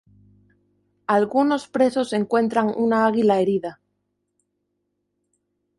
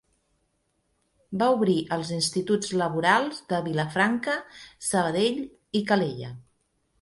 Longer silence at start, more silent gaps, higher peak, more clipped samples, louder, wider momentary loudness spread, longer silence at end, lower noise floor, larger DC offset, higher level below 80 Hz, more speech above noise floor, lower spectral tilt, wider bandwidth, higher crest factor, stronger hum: second, 1.1 s vs 1.3 s; neither; about the same, -6 dBFS vs -6 dBFS; neither; first, -21 LUFS vs -25 LUFS; second, 5 LU vs 10 LU; first, 2.05 s vs 0.6 s; about the same, -75 dBFS vs -73 dBFS; neither; about the same, -68 dBFS vs -64 dBFS; first, 56 dB vs 47 dB; first, -6.5 dB/octave vs -4.5 dB/octave; about the same, 11.5 kHz vs 12 kHz; about the same, 18 dB vs 20 dB; first, 50 Hz at -50 dBFS vs none